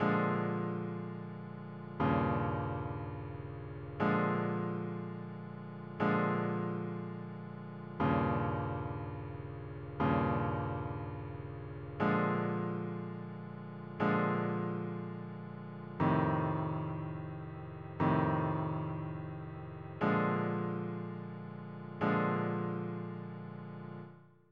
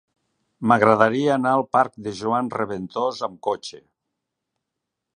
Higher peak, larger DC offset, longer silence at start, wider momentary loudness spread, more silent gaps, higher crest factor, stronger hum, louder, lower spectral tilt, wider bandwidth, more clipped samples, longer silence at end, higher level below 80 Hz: second, -18 dBFS vs 0 dBFS; neither; second, 0 s vs 0.6 s; about the same, 14 LU vs 12 LU; neither; about the same, 18 dB vs 22 dB; neither; second, -36 LUFS vs -21 LUFS; first, -10 dB/octave vs -6 dB/octave; second, 5.4 kHz vs 10.5 kHz; neither; second, 0.25 s vs 1.35 s; about the same, -60 dBFS vs -64 dBFS